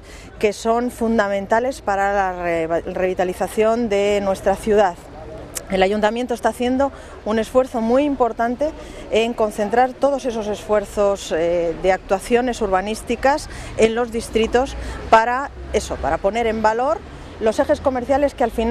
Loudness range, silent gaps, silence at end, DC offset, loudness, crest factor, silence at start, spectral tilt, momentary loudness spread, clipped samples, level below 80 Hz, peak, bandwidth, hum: 1 LU; none; 0 s; under 0.1%; -20 LUFS; 20 dB; 0 s; -5 dB/octave; 7 LU; under 0.1%; -38 dBFS; 0 dBFS; 14 kHz; none